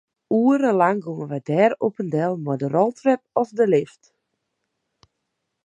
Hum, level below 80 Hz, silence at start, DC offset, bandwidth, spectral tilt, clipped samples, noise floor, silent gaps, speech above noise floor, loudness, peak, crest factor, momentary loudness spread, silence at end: none; -72 dBFS; 0.3 s; under 0.1%; 9.4 kHz; -8 dB/octave; under 0.1%; -78 dBFS; none; 57 dB; -21 LUFS; -4 dBFS; 18 dB; 8 LU; 1.8 s